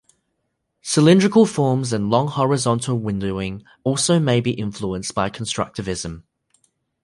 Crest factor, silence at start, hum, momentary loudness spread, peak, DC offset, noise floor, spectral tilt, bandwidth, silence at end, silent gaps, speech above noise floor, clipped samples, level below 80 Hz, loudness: 18 dB; 0.85 s; none; 13 LU; -2 dBFS; under 0.1%; -74 dBFS; -5.5 dB/octave; 11.5 kHz; 0.85 s; none; 55 dB; under 0.1%; -48 dBFS; -20 LUFS